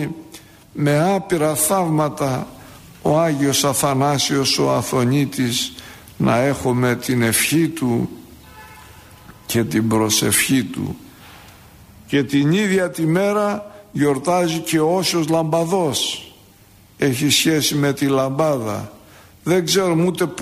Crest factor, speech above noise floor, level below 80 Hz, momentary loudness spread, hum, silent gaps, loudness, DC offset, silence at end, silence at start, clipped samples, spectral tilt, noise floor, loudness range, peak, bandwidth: 16 dB; 31 dB; -52 dBFS; 11 LU; none; none; -18 LUFS; under 0.1%; 0 s; 0 s; under 0.1%; -4.5 dB/octave; -48 dBFS; 2 LU; -4 dBFS; 15.5 kHz